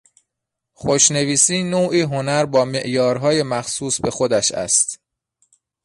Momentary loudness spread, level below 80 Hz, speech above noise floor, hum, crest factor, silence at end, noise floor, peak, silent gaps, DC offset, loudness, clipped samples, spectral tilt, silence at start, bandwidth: 8 LU; -54 dBFS; 63 dB; none; 20 dB; 0.9 s; -81 dBFS; 0 dBFS; none; under 0.1%; -17 LUFS; under 0.1%; -3 dB/octave; 0.8 s; 11.5 kHz